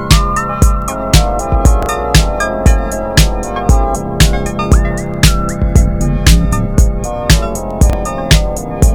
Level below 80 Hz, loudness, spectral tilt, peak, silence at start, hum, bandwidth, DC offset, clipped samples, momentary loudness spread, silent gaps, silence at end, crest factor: -14 dBFS; -13 LUFS; -5 dB/octave; 0 dBFS; 0 s; none; 18.5 kHz; under 0.1%; 0.8%; 5 LU; none; 0 s; 10 dB